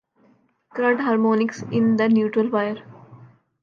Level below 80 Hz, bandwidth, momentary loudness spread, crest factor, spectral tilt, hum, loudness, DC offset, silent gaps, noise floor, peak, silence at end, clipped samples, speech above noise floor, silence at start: -72 dBFS; 7 kHz; 8 LU; 14 dB; -7 dB/octave; none; -21 LUFS; under 0.1%; none; -60 dBFS; -8 dBFS; 0.4 s; under 0.1%; 40 dB; 0.75 s